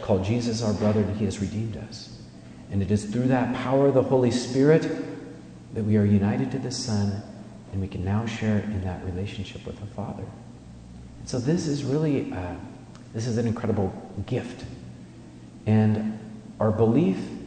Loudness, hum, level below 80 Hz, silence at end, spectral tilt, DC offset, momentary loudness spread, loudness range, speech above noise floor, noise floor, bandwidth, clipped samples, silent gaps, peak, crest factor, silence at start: -25 LUFS; none; -52 dBFS; 0 s; -7 dB/octave; under 0.1%; 21 LU; 8 LU; 20 dB; -44 dBFS; 9.4 kHz; under 0.1%; none; -8 dBFS; 18 dB; 0 s